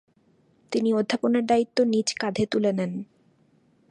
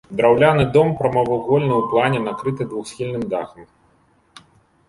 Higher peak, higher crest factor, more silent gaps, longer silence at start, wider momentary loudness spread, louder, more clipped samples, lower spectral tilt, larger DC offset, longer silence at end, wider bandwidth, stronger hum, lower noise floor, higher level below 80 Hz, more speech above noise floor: second, -8 dBFS vs -2 dBFS; about the same, 18 dB vs 18 dB; neither; first, 0.7 s vs 0.1 s; second, 9 LU vs 13 LU; second, -24 LUFS vs -18 LUFS; neither; second, -5 dB/octave vs -7 dB/octave; neither; second, 0.85 s vs 1.25 s; about the same, 10.5 kHz vs 11.5 kHz; neither; first, -63 dBFS vs -58 dBFS; second, -64 dBFS vs -50 dBFS; about the same, 39 dB vs 40 dB